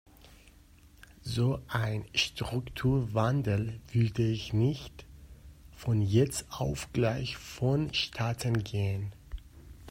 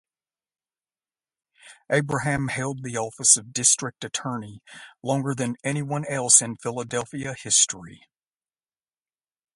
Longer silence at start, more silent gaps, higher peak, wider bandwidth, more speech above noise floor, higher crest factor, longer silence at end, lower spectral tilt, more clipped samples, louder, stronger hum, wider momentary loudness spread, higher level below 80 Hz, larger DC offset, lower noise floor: second, 0.25 s vs 1.65 s; neither; second, -14 dBFS vs -2 dBFS; first, 16 kHz vs 11.5 kHz; second, 27 dB vs over 65 dB; second, 18 dB vs 26 dB; second, 0 s vs 1.6 s; first, -6 dB/octave vs -2.5 dB/octave; neither; second, -31 LUFS vs -22 LUFS; neither; second, 12 LU vs 16 LU; first, -50 dBFS vs -62 dBFS; neither; second, -57 dBFS vs under -90 dBFS